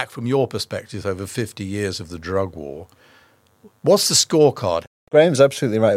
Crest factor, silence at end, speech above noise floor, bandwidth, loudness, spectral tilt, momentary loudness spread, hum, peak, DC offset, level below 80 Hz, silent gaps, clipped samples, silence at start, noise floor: 18 dB; 0 s; 36 dB; 16.5 kHz; -19 LUFS; -4 dB/octave; 14 LU; none; -2 dBFS; under 0.1%; -58 dBFS; 4.87-5.07 s; under 0.1%; 0 s; -55 dBFS